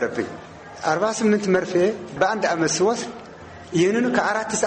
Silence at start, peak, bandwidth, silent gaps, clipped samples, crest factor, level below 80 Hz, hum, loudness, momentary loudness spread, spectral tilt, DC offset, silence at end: 0 s; -6 dBFS; 8.8 kHz; none; under 0.1%; 16 dB; -58 dBFS; none; -21 LUFS; 18 LU; -4.5 dB/octave; under 0.1%; 0 s